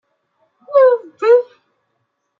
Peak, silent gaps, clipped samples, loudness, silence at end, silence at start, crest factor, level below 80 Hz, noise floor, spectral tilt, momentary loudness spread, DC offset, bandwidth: -2 dBFS; none; under 0.1%; -14 LUFS; 0.95 s; 0.7 s; 14 dB; -74 dBFS; -70 dBFS; -4 dB/octave; 6 LU; under 0.1%; 5.2 kHz